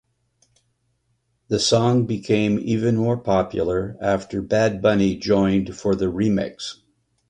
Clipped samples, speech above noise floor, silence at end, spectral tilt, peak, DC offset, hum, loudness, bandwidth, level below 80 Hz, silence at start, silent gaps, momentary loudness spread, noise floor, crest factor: under 0.1%; 49 dB; 0.55 s; -6 dB/octave; -4 dBFS; under 0.1%; none; -21 LUFS; 10.5 kHz; -46 dBFS; 1.5 s; none; 6 LU; -69 dBFS; 18 dB